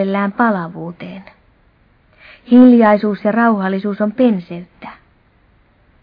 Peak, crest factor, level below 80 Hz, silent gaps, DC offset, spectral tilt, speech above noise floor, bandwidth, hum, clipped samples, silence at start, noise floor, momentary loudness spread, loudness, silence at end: 0 dBFS; 16 dB; -56 dBFS; none; under 0.1%; -10.5 dB/octave; 40 dB; 4.9 kHz; none; under 0.1%; 0 s; -53 dBFS; 25 LU; -13 LUFS; 1.1 s